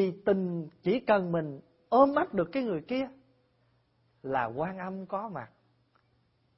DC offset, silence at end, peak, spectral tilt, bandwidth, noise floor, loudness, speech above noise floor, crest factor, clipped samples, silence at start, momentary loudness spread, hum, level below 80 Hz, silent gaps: under 0.1%; 1.1 s; -10 dBFS; -10.5 dB/octave; 5.8 kHz; -70 dBFS; -30 LUFS; 41 dB; 20 dB; under 0.1%; 0 s; 16 LU; none; -66 dBFS; none